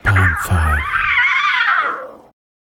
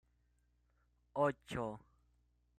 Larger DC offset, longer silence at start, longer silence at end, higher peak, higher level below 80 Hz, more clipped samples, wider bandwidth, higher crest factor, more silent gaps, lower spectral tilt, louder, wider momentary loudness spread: neither; second, 0.05 s vs 1.15 s; second, 0.45 s vs 0.8 s; first, -2 dBFS vs -22 dBFS; first, -28 dBFS vs -70 dBFS; neither; first, 17 kHz vs 14 kHz; second, 14 dB vs 22 dB; neither; second, -4.5 dB/octave vs -6.5 dB/octave; first, -15 LUFS vs -40 LUFS; about the same, 9 LU vs 11 LU